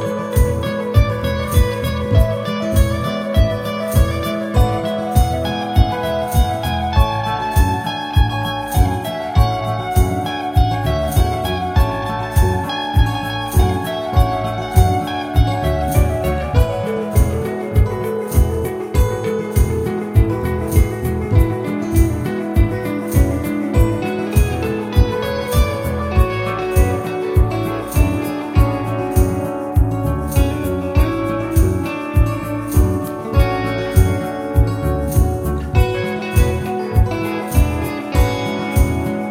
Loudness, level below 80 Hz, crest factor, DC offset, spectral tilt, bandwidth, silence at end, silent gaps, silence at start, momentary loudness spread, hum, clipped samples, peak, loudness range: -18 LUFS; -20 dBFS; 16 dB; under 0.1%; -6.5 dB/octave; 16.5 kHz; 0 s; none; 0 s; 4 LU; none; under 0.1%; 0 dBFS; 1 LU